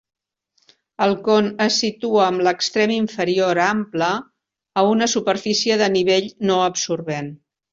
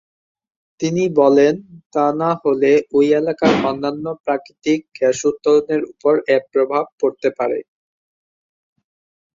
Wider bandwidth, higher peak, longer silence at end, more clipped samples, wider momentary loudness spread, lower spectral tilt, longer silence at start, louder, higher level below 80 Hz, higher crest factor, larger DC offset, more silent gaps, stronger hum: about the same, 7.8 kHz vs 7.6 kHz; about the same, -2 dBFS vs -2 dBFS; second, 0.4 s vs 1.75 s; neither; about the same, 6 LU vs 8 LU; second, -3.5 dB/octave vs -5.5 dB/octave; first, 1 s vs 0.8 s; about the same, -19 LUFS vs -17 LUFS; about the same, -62 dBFS vs -60 dBFS; about the same, 16 dB vs 16 dB; neither; second, none vs 1.86-1.90 s, 4.20-4.24 s, 6.92-6.98 s; neither